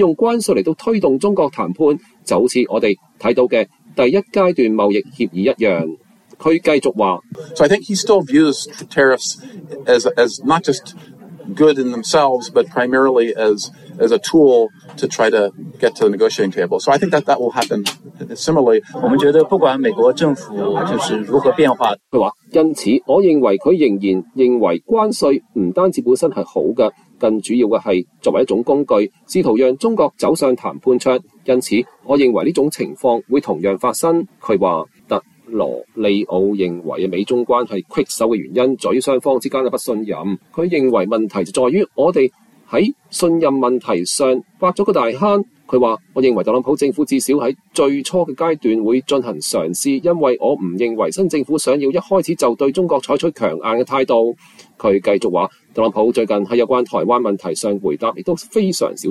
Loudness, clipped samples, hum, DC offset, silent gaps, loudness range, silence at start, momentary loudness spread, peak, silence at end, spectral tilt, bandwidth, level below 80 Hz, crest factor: -16 LUFS; under 0.1%; none; under 0.1%; none; 3 LU; 0 s; 7 LU; -2 dBFS; 0 s; -5 dB/octave; 14 kHz; -58 dBFS; 14 dB